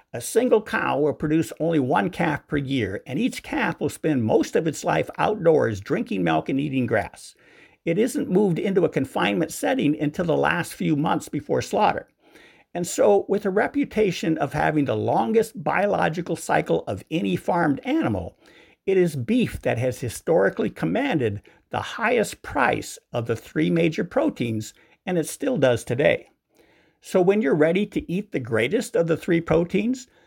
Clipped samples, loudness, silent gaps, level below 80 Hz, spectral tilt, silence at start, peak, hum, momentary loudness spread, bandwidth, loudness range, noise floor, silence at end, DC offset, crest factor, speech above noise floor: under 0.1%; -23 LUFS; none; -52 dBFS; -6 dB/octave; 0.15 s; -4 dBFS; none; 7 LU; 17 kHz; 2 LU; -60 dBFS; 0.2 s; under 0.1%; 20 dB; 37 dB